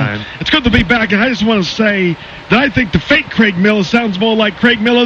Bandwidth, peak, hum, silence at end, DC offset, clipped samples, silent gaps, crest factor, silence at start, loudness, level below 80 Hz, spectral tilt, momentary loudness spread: 7.4 kHz; 0 dBFS; none; 0 s; under 0.1%; under 0.1%; none; 12 dB; 0 s; -12 LUFS; -32 dBFS; -5.5 dB/octave; 4 LU